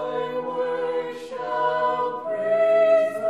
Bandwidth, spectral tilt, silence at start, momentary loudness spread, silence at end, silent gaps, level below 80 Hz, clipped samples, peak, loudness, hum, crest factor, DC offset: 11 kHz; -5 dB/octave; 0 s; 11 LU; 0 s; none; -72 dBFS; under 0.1%; -10 dBFS; -23 LUFS; none; 14 dB; 0.1%